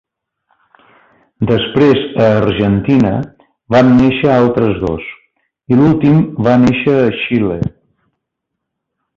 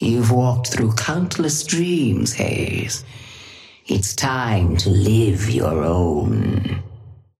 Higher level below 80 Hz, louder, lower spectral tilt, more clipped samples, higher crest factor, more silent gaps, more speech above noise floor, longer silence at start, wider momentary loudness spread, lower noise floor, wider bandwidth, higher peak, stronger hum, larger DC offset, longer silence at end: about the same, -38 dBFS vs -38 dBFS; first, -12 LUFS vs -19 LUFS; first, -8.5 dB/octave vs -5 dB/octave; neither; about the same, 12 dB vs 16 dB; neither; first, 65 dB vs 24 dB; first, 1.4 s vs 0 s; second, 11 LU vs 14 LU; first, -76 dBFS vs -42 dBFS; second, 7.2 kHz vs 15 kHz; first, 0 dBFS vs -4 dBFS; neither; neither; first, 1.45 s vs 0.25 s